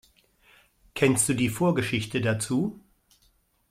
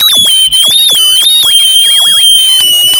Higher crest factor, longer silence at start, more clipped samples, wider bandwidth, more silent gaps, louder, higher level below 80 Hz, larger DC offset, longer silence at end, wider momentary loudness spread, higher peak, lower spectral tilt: first, 20 dB vs 6 dB; first, 0.95 s vs 0 s; second, under 0.1% vs 0.2%; second, 16 kHz vs 18 kHz; neither; second, -25 LUFS vs -2 LUFS; second, -58 dBFS vs -46 dBFS; neither; first, 0.95 s vs 0 s; first, 6 LU vs 1 LU; second, -8 dBFS vs 0 dBFS; first, -4.5 dB/octave vs 2.5 dB/octave